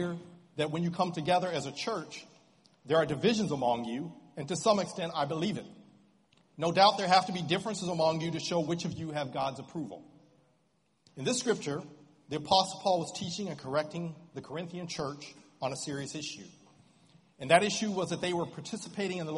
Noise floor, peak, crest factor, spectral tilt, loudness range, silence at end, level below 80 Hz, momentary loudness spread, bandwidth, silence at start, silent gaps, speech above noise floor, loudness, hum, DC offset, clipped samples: -73 dBFS; -8 dBFS; 26 dB; -4.5 dB/octave; 8 LU; 0 s; -70 dBFS; 15 LU; 11.5 kHz; 0 s; none; 42 dB; -31 LUFS; none; under 0.1%; under 0.1%